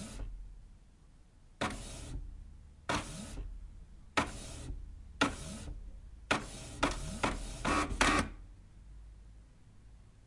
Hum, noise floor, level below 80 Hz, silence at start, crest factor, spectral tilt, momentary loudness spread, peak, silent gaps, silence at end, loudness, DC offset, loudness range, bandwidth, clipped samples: none; -59 dBFS; -46 dBFS; 0 s; 26 dB; -3.5 dB/octave; 23 LU; -12 dBFS; none; 0.1 s; -36 LUFS; under 0.1%; 8 LU; 11.5 kHz; under 0.1%